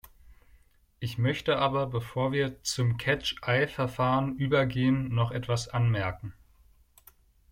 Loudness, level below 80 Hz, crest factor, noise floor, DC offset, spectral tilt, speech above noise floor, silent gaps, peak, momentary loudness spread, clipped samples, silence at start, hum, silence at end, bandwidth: -28 LUFS; -54 dBFS; 16 dB; -61 dBFS; under 0.1%; -5.5 dB/octave; 33 dB; none; -12 dBFS; 5 LU; under 0.1%; 0.05 s; none; 1.2 s; 16 kHz